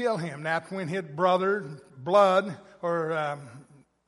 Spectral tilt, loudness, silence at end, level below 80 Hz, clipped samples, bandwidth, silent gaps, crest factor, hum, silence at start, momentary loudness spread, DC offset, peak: -6 dB/octave; -26 LUFS; 0.45 s; -76 dBFS; under 0.1%; 11.5 kHz; none; 18 dB; none; 0 s; 16 LU; under 0.1%; -8 dBFS